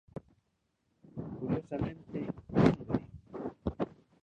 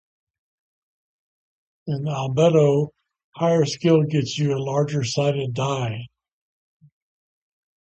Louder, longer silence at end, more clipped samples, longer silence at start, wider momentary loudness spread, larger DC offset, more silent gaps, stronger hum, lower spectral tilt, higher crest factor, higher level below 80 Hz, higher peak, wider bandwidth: second, -35 LUFS vs -21 LUFS; second, 0.3 s vs 1.75 s; neither; second, 0.15 s vs 1.85 s; first, 20 LU vs 11 LU; neither; second, none vs 3.24-3.32 s; neither; first, -9 dB/octave vs -6.5 dB/octave; first, 24 dB vs 18 dB; first, -54 dBFS vs -62 dBFS; second, -10 dBFS vs -6 dBFS; about the same, 8.6 kHz vs 8.4 kHz